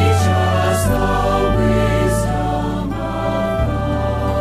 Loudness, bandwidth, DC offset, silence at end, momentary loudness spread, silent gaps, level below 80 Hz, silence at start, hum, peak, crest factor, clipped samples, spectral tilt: -17 LUFS; 15.5 kHz; under 0.1%; 0 s; 5 LU; none; -26 dBFS; 0 s; none; -4 dBFS; 12 dB; under 0.1%; -6 dB/octave